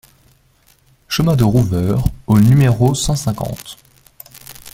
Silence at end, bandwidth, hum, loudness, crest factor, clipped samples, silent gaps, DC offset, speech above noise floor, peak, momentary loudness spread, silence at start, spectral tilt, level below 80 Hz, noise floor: 0.05 s; 16.5 kHz; none; -15 LUFS; 16 dB; under 0.1%; none; under 0.1%; 40 dB; -2 dBFS; 23 LU; 1.1 s; -6.5 dB/octave; -34 dBFS; -54 dBFS